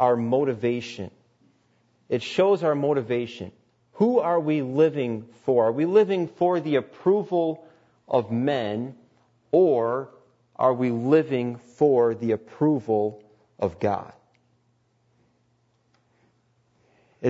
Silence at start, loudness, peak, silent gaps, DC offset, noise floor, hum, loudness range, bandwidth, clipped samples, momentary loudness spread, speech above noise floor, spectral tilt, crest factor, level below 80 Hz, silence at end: 0 s; -24 LUFS; -8 dBFS; none; under 0.1%; -67 dBFS; none; 6 LU; 8 kHz; under 0.1%; 11 LU; 44 dB; -8 dB/octave; 18 dB; -68 dBFS; 0 s